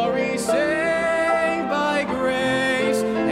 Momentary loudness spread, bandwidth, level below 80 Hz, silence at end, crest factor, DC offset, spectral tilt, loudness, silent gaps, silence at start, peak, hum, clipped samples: 2 LU; 16 kHz; -52 dBFS; 0 s; 12 dB; under 0.1%; -4 dB/octave; -21 LUFS; none; 0 s; -10 dBFS; none; under 0.1%